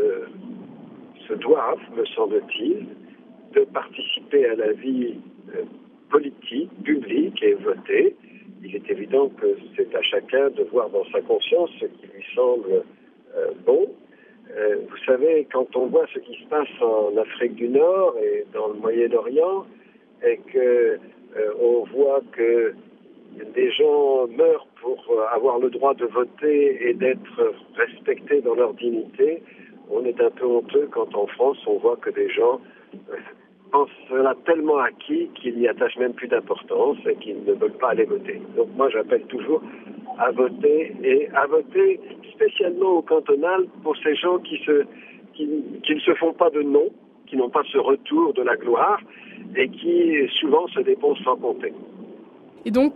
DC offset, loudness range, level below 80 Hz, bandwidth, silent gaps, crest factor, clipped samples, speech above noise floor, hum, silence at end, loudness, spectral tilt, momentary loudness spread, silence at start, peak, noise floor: under 0.1%; 3 LU; -74 dBFS; 4.5 kHz; none; 18 dB; under 0.1%; 26 dB; none; 0 s; -22 LUFS; -2 dB/octave; 11 LU; 0 s; -4 dBFS; -47 dBFS